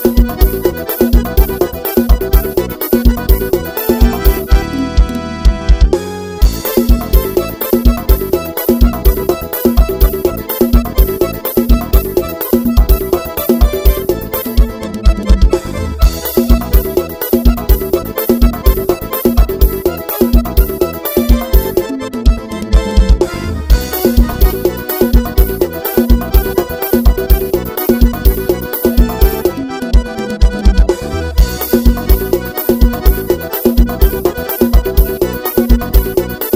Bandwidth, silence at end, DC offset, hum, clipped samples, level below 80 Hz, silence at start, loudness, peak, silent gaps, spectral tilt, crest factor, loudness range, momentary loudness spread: 16.5 kHz; 0 s; under 0.1%; none; 1%; -12 dBFS; 0 s; -13 LUFS; 0 dBFS; none; -6.5 dB/octave; 10 dB; 1 LU; 4 LU